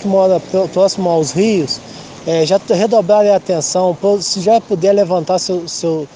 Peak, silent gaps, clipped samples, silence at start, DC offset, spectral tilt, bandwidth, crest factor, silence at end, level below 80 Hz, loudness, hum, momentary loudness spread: 0 dBFS; none; under 0.1%; 0 s; under 0.1%; -5 dB/octave; 10 kHz; 12 dB; 0.1 s; -58 dBFS; -14 LUFS; none; 7 LU